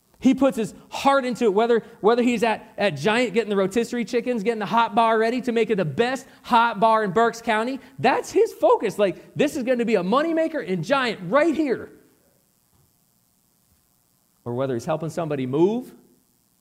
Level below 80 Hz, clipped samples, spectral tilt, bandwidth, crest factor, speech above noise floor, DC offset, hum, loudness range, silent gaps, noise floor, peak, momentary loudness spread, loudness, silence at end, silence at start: -64 dBFS; under 0.1%; -5.5 dB/octave; 16 kHz; 16 dB; 43 dB; under 0.1%; none; 7 LU; none; -64 dBFS; -6 dBFS; 8 LU; -22 LUFS; 0.7 s; 0.2 s